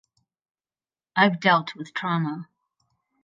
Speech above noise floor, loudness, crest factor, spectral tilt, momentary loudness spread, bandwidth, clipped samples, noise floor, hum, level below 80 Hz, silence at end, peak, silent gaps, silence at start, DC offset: over 67 dB; -23 LUFS; 22 dB; -6.5 dB/octave; 13 LU; 7.6 kHz; under 0.1%; under -90 dBFS; none; -78 dBFS; 0.8 s; -4 dBFS; none; 1.15 s; under 0.1%